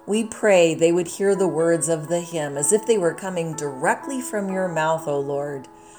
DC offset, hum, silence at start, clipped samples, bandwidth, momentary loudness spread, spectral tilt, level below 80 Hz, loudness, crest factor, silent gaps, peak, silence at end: under 0.1%; none; 0.05 s; under 0.1%; over 20 kHz; 10 LU; -4.5 dB/octave; -68 dBFS; -22 LUFS; 16 dB; none; -4 dBFS; 0 s